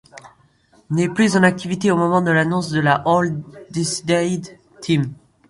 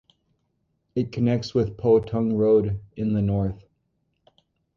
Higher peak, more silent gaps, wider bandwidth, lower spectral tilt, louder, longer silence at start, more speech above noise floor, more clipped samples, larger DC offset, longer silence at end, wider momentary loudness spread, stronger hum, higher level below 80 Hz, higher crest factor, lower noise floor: first, -2 dBFS vs -8 dBFS; neither; first, 11.5 kHz vs 7 kHz; second, -5.5 dB/octave vs -9 dB/octave; first, -19 LUFS vs -23 LUFS; second, 0.15 s vs 0.95 s; second, 37 dB vs 51 dB; neither; neither; second, 0.35 s vs 1.2 s; about the same, 12 LU vs 10 LU; neither; second, -56 dBFS vs -48 dBFS; about the same, 18 dB vs 16 dB; second, -55 dBFS vs -73 dBFS